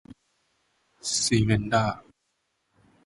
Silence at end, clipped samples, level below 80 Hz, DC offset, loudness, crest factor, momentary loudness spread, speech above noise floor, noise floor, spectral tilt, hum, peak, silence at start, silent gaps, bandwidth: 1.05 s; under 0.1%; -50 dBFS; under 0.1%; -25 LUFS; 20 dB; 12 LU; 52 dB; -76 dBFS; -4 dB/octave; none; -8 dBFS; 1.05 s; none; 11.5 kHz